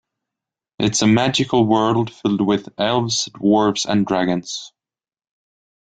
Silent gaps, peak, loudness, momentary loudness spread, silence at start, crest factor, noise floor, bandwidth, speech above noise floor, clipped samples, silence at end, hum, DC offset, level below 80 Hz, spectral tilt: none; -2 dBFS; -18 LUFS; 6 LU; 0.8 s; 16 dB; under -90 dBFS; 9.4 kHz; over 72 dB; under 0.1%; 1.3 s; none; under 0.1%; -54 dBFS; -4.5 dB/octave